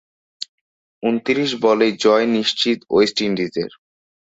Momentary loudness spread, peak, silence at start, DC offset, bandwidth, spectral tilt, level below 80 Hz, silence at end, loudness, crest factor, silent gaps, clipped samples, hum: 17 LU; -2 dBFS; 0.4 s; under 0.1%; 8 kHz; -4.5 dB/octave; -60 dBFS; 0.65 s; -18 LUFS; 16 dB; 0.49-1.01 s; under 0.1%; none